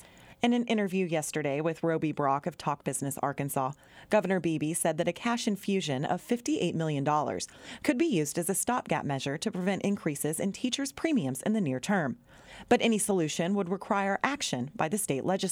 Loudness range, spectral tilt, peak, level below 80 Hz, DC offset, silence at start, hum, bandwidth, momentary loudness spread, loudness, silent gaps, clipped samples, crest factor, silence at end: 1 LU; -4.5 dB/octave; -10 dBFS; -66 dBFS; under 0.1%; 0 s; none; 19 kHz; 5 LU; -30 LUFS; none; under 0.1%; 20 dB; 0 s